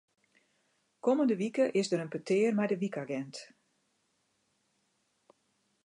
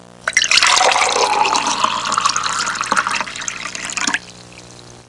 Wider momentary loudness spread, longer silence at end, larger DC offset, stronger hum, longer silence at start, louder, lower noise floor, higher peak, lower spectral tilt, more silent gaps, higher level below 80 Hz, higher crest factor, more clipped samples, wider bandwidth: about the same, 10 LU vs 12 LU; first, 2.4 s vs 0.05 s; second, under 0.1% vs 0.2%; second, none vs 60 Hz at -45 dBFS; first, 1.05 s vs 0.25 s; second, -31 LUFS vs -15 LUFS; first, -76 dBFS vs -39 dBFS; second, -16 dBFS vs 0 dBFS; first, -6 dB/octave vs 0 dB/octave; neither; second, -86 dBFS vs -54 dBFS; about the same, 18 dB vs 18 dB; neither; about the same, 11 kHz vs 11.5 kHz